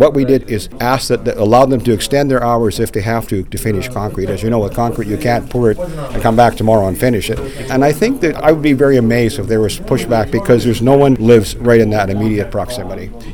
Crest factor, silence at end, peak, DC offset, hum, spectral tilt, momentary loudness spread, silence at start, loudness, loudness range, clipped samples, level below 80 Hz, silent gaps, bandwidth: 12 dB; 0 s; 0 dBFS; 2%; none; -6.5 dB/octave; 9 LU; 0 s; -14 LUFS; 4 LU; 0.4%; -30 dBFS; none; 19 kHz